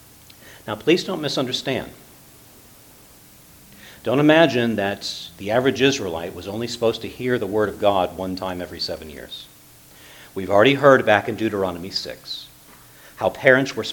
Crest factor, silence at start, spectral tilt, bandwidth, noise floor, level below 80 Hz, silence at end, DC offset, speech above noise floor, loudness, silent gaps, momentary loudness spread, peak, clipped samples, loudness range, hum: 22 dB; 0.45 s; -5 dB/octave; 19 kHz; -48 dBFS; -54 dBFS; 0 s; under 0.1%; 28 dB; -20 LUFS; none; 17 LU; 0 dBFS; under 0.1%; 6 LU; none